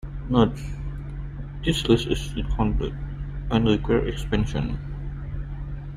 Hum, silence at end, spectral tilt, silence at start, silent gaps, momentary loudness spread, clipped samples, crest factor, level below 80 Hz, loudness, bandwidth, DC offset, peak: none; 0 s; -6.5 dB/octave; 0.05 s; none; 13 LU; under 0.1%; 20 dB; -32 dBFS; -26 LUFS; 14.5 kHz; under 0.1%; -4 dBFS